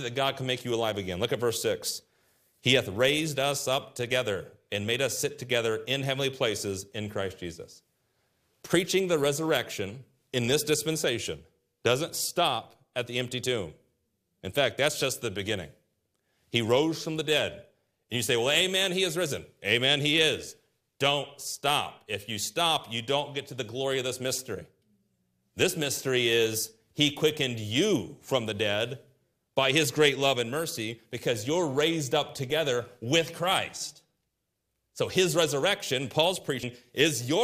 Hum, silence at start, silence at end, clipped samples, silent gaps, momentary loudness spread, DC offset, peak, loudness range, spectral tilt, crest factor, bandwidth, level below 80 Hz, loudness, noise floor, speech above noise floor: none; 0 s; 0 s; under 0.1%; none; 11 LU; under 0.1%; -6 dBFS; 4 LU; -3.5 dB/octave; 22 dB; 15.5 kHz; -66 dBFS; -28 LUFS; -81 dBFS; 52 dB